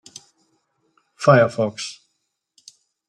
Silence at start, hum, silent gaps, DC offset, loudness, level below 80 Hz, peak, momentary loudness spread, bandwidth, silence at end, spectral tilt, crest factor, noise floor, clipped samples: 1.2 s; none; none; under 0.1%; -19 LUFS; -64 dBFS; -2 dBFS; 17 LU; 11 kHz; 1.15 s; -6 dB/octave; 22 dB; -75 dBFS; under 0.1%